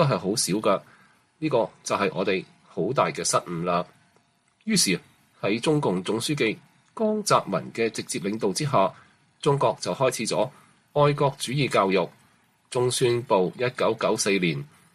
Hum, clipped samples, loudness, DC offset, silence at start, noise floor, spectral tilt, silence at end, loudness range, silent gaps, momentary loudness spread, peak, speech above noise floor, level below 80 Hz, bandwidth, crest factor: none; under 0.1%; -25 LUFS; under 0.1%; 0 s; -64 dBFS; -4.5 dB/octave; 0.3 s; 2 LU; none; 8 LU; -6 dBFS; 40 dB; -64 dBFS; 15 kHz; 18 dB